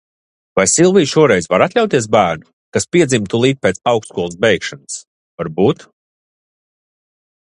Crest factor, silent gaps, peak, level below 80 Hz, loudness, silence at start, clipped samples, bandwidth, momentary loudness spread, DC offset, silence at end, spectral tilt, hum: 16 dB; 2.53-2.72 s, 5.07-5.38 s; 0 dBFS; -50 dBFS; -14 LUFS; 0.55 s; under 0.1%; 11.5 kHz; 14 LU; under 0.1%; 1.8 s; -4.5 dB/octave; none